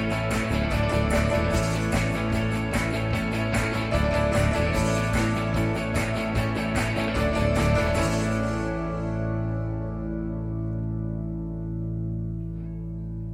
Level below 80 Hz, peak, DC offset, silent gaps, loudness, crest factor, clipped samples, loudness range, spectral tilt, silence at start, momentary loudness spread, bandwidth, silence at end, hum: -34 dBFS; -10 dBFS; under 0.1%; none; -26 LUFS; 14 dB; under 0.1%; 6 LU; -6 dB/octave; 0 s; 8 LU; 15.5 kHz; 0 s; none